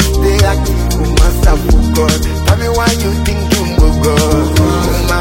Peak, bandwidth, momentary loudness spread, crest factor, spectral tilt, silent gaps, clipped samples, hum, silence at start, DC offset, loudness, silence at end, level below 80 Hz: 0 dBFS; 17 kHz; 3 LU; 10 dB; -5 dB/octave; none; under 0.1%; none; 0 s; under 0.1%; -12 LUFS; 0 s; -14 dBFS